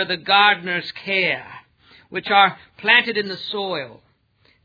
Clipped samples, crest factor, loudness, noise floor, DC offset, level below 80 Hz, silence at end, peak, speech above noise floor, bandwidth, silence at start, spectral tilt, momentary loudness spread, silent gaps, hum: under 0.1%; 20 dB; -18 LUFS; -60 dBFS; under 0.1%; -66 dBFS; 0.7 s; 0 dBFS; 40 dB; 5 kHz; 0 s; -5 dB/octave; 14 LU; none; none